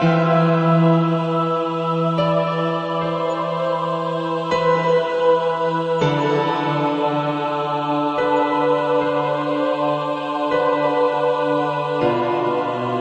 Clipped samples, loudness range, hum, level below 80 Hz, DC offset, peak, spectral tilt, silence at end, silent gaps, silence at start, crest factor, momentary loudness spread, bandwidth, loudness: under 0.1%; 1 LU; none; -60 dBFS; under 0.1%; -4 dBFS; -7.5 dB/octave; 0 s; none; 0 s; 14 dB; 6 LU; 8.2 kHz; -19 LUFS